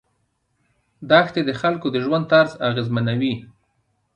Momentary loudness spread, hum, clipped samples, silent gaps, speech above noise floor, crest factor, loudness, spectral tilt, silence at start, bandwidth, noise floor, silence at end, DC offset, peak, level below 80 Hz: 8 LU; none; under 0.1%; none; 50 dB; 20 dB; -19 LUFS; -7 dB/octave; 1 s; 8.6 kHz; -69 dBFS; 0.7 s; under 0.1%; -2 dBFS; -60 dBFS